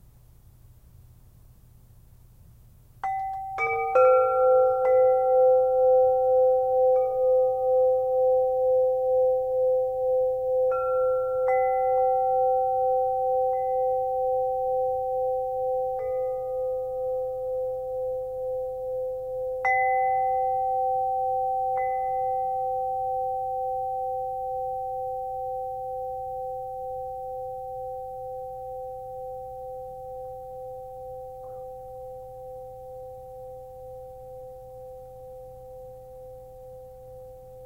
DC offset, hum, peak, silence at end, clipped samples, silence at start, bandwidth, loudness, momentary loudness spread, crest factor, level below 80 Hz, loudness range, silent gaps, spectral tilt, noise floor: under 0.1%; none; -10 dBFS; 0 s; under 0.1%; 0.65 s; 2.7 kHz; -25 LUFS; 22 LU; 16 dB; -56 dBFS; 20 LU; none; -6.5 dB/octave; -53 dBFS